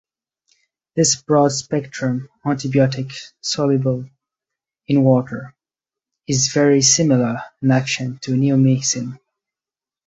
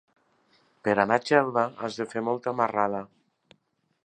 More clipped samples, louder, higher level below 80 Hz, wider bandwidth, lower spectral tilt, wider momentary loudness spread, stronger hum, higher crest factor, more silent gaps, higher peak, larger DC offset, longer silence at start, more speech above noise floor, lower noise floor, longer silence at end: neither; first, -18 LUFS vs -26 LUFS; first, -58 dBFS vs -70 dBFS; second, 8.4 kHz vs 9.6 kHz; about the same, -4.5 dB/octave vs -5.5 dB/octave; first, 13 LU vs 10 LU; neither; second, 18 dB vs 24 dB; neither; about the same, -2 dBFS vs -4 dBFS; neither; about the same, 0.95 s vs 0.85 s; first, over 72 dB vs 47 dB; first, under -90 dBFS vs -72 dBFS; about the same, 0.9 s vs 1 s